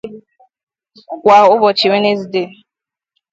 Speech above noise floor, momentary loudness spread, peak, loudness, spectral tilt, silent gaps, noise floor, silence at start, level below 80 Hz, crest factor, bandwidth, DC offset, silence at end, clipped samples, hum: 74 dB; 21 LU; 0 dBFS; -12 LUFS; -5 dB/octave; 0.63-0.67 s; -85 dBFS; 0.05 s; -62 dBFS; 14 dB; 7.8 kHz; under 0.1%; 0.85 s; under 0.1%; none